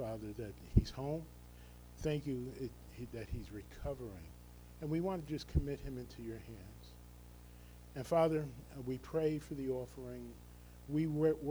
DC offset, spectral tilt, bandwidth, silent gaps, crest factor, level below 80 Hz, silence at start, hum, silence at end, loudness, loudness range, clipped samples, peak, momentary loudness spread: under 0.1%; -7.5 dB/octave; over 20 kHz; none; 24 dB; -50 dBFS; 0 s; 60 Hz at -55 dBFS; 0 s; -40 LUFS; 5 LU; under 0.1%; -16 dBFS; 22 LU